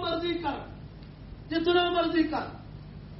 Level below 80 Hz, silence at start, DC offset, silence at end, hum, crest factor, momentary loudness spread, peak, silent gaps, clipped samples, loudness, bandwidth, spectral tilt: -50 dBFS; 0 s; under 0.1%; 0 s; 50 Hz at -50 dBFS; 18 dB; 22 LU; -12 dBFS; none; under 0.1%; -28 LUFS; 5.8 kHz; -3.5 dB/octave